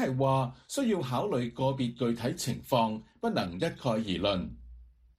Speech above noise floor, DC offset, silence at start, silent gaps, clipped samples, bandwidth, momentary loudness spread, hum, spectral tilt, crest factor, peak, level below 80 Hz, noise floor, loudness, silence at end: 23 dB; under 0.1%; 0 s; none; under 0.1%; 15.5 kHz; 6 LU; none; -6 dB/octave; 18 dB; -12 dBFS; -56 dBFS; -53 dBFS; -31 LUFS; 0.35 s